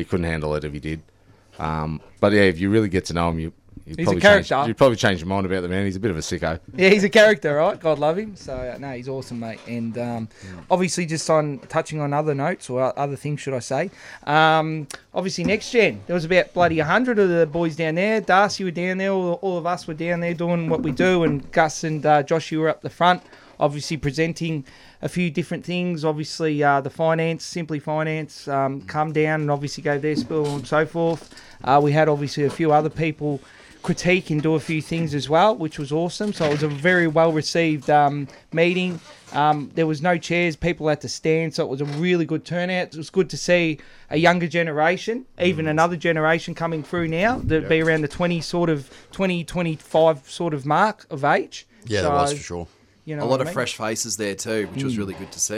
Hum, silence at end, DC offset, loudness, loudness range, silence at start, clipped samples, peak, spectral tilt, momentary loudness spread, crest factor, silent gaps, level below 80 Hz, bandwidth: none; 0 s; under 0.1%; -21 LUFS; 5 LU; 0 s; under 0.1%; -2 dBFS; -5.5 dB/octave; 11 LU; 20 dB; none; -48 dBFS; 14 kHz